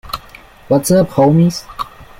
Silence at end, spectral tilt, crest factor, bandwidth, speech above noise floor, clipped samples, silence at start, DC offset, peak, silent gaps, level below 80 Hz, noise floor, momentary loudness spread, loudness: 0.15 s; -6.5 dB/octave; 14 dB; 16.5 kHz; 28 dB; under 0.1%; 0.05 s; under 0.1%; -2 dBFS; none; -40 dBFS; -40 dBFS; 16 LU; -13 LUFS